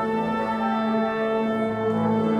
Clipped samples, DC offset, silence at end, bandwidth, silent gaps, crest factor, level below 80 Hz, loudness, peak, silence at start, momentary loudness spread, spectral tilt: under 0.1%; under 0.1%; 0 s; 8.8 kHz; none; 12 dB; -58 dBFS; -24 LUFS; -10 dBFS; 0 s; 2 LU; -8 dB/octave